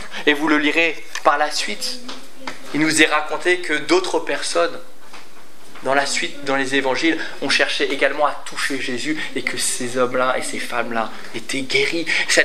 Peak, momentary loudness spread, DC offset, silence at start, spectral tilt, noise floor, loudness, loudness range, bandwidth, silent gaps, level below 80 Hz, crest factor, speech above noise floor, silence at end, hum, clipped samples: 0 dBFS; 10 LU; 5%; 0 s; -2 dB/octave; -45 dBFS; -19 LUFS; 3 LU; 15 kHz; none; -70 dBFS; 20 dB; 25 dB; 0 s; none; under 0.1%